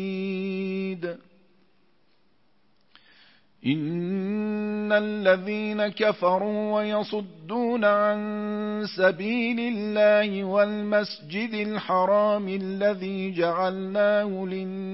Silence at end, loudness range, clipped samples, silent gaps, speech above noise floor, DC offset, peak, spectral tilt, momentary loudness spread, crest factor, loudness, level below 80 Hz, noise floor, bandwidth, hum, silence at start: 0 s; 10 LU; under 0.1%; none; 44 dB; under 0.1%; -8 dBFS; -9.5 dB/octave; 9 LU; 18 dB; -25 LUFS; -76 dBFS; -68 dBFS; 5.8 kHz; none; 0 s